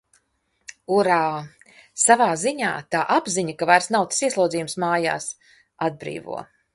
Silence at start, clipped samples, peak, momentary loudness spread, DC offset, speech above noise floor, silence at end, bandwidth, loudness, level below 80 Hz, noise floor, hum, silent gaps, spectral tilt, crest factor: 0.7 s; under 0.1%; -2 dBFS; 16 LU; under 0.1%; 48 dB; 0.3 s; 11.5 kHz; -21 LUFS; -66 dBFS; -70 dBFS; none; none; -3 dB/octave; 22 dB